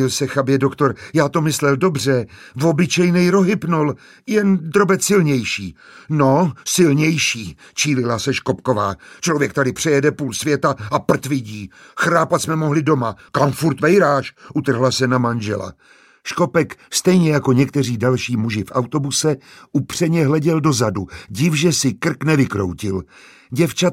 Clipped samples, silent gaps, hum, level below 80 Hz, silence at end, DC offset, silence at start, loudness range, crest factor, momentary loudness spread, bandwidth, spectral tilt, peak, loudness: under 0.1%; none; none; -54 dBFS; 0 s; under 0.1%; 0 s; 2 LU; 16 dB; 9 LU; 16 kHz; -5 dB/octave; -2 dBFS; -18 LUFS